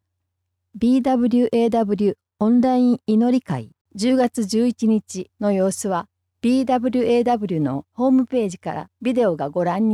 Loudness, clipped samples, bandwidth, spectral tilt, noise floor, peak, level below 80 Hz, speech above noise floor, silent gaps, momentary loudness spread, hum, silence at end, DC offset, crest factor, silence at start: -20 LUFS; under 0.1%; 12.5 kHz; -6.5 dB/octave; -76 dBFS; -8 dBFS; -58 dBFS; 58 dB; 3.81-3.85 s; 8 LU; none; 0 s; under 0.1%; 12 dB; 0.75 s